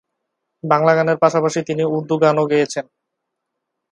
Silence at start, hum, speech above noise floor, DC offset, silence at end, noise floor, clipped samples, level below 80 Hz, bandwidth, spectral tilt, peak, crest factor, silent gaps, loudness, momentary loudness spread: 0.65 s; none; 62 dB; under 0.1%; 1.1 s; -78 dBFS; under 0.1%; -66 dBFS; 11 kHz; -6 dB/octave; 0 dBFS; 18 dB; none; -17 LUFS; 7 LU